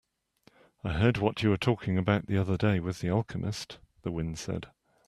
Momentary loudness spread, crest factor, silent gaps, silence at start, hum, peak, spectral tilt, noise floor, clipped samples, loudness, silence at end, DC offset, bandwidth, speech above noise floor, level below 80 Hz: 12 LU; 22 dB; none; 0.85 s; none; -8 dBFS; -6.5 dB/octave; -65 dBFS; under 0.1%; -30 LUFS; 0.4 s; under 0.1%; 12.5 kHz; 37 dB; -52 dBFS